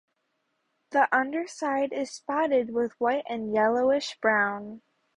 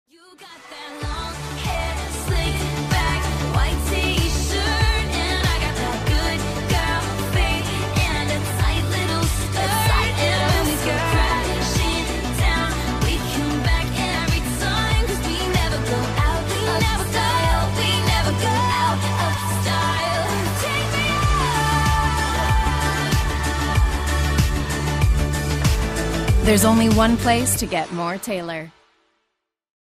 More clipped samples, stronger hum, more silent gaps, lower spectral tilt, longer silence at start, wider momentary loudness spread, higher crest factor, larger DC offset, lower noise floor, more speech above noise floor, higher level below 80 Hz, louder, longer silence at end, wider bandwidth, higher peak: neither; neither; neither; about the same, -4 dB/octave vs -4.5 dB/octave; first, 0.9 s vs 0.4 s; about the same, 7 LU vs 6 LU; about the same, 18 dB vs 16 dB; neither; about the same, -76 dBFS vs -77 dBFS; second, 50 dB vs 58 dB; second, -70 dBFS vs -26 dBFS; second, -26 LUFS vs -20 LUFS; second, 0.4 s vs 1.1 s; second, 11 kHz vs 15.5 kHz; second, -10 dBFS vs -4 dBFS